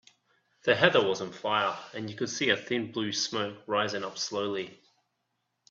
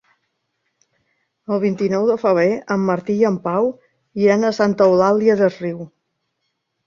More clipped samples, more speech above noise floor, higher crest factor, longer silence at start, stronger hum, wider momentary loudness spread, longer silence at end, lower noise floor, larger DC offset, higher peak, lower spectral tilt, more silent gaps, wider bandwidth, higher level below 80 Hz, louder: neither; second, 51 dB vs 57 dB; first, 26 dB vs 16 dB; second, 0.65 s vs 1.5 s; neither; about the same, 11 LU vs 13 LU; about the same, 0.95 s vs 1 s; first, -80 dBFS vs -73 dBFS; neither; about the same, -4 dBFS vs -2 dBFS; second, -3.5 dB/octave vs -7 dB/octave; neither; about the same, 7.8 kHz vs 7.4 kHz; second, -72 dBFS vs -62 dBFS; second, -29 LUFS vs -17 LUFS